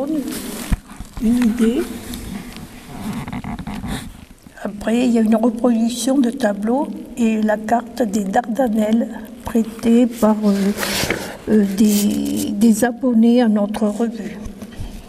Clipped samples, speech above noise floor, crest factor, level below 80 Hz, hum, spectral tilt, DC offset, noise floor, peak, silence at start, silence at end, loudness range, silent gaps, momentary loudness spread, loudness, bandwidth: under 0.1%; 24 dB; 14 dB; -38 dBFS; none; -5.5 dB/octave; under 0.1%; -40 dBFS; -4 dBFS; 0 s; 0 s; 6 LU; none; 15 LU; -18 LUFS; 15.5 kHz